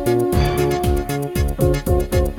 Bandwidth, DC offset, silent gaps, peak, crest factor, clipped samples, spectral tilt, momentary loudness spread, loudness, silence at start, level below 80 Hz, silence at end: 18.5 kHz; under 0.1%; none; -4 dBFS; 14 dB; under 0.1%; -6.5 dB/octave; 4 LU; -19 LUFS; 0 s; -24 dBFS; 0 s